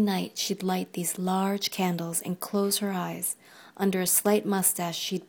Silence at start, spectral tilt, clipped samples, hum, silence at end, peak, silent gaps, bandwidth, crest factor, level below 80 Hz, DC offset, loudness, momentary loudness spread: 0 s; -4 dB/octave; under 0.1%; none; 0.05 s; -8 dBFS; none; 19.5 kHz; 20 dB; -74 dBFS; under 0.1%; -27 LUFS; 8 LU